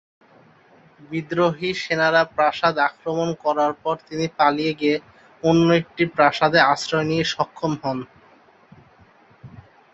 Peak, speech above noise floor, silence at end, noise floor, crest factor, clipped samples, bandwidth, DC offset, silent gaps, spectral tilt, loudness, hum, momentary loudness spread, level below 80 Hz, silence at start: -2 dBFS; 33 dB; 0.35 s; -53 dBFS; 20 dB; under 0.1%; 8.2 kHz; under 0.1%; none; -5.5 dB/octave; -21 LUFS; none; 10 LU; -60 dBFS; 1.1 s